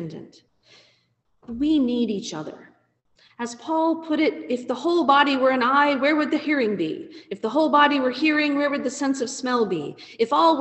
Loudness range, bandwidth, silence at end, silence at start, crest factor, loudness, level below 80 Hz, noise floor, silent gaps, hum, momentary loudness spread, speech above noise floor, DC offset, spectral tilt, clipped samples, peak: 7 LU; 8.6 kHz; 0 s; 0 s; 20 dB; -22 LUFS; -62 dBFS; -67 dBFS; none; none; 16 LU; 45 dB; under 0.1%; -4 dB/octave; under 0.1%; -4 dBFS